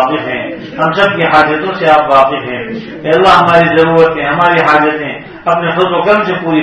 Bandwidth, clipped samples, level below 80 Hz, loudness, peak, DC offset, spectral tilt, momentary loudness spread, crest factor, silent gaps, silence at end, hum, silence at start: 12 kHz; 1%; -44 dBFS; -10 LUFS; 0 dBFS; under 0.1%; -6.5 dB/octave; 12 LU; 10 dB; none; 0 s; none; 0 s